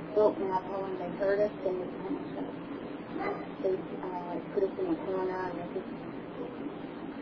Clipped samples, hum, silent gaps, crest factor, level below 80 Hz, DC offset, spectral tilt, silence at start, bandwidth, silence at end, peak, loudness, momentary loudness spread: under 0.1%; none; none; 22 dB; -64 dBFS; under 0.1%; -6 dB/octave; 0 s; 5.4 kHz; 0 s; -12 dBFS; -34 LUFS; 11 LU